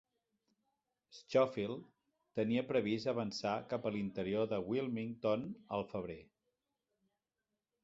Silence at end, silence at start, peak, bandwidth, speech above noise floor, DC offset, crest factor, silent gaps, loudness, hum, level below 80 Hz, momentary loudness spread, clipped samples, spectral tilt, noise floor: 1.6 s; 1.1 s; -20 dBFS; 7.8 kHz; over 53 dB; under 0.1%; 20 dB; none; -38 LUFS; none; -72 dBFS; 10 LU; under 0.1%; -5.5 dB/octave; under -90 dBFS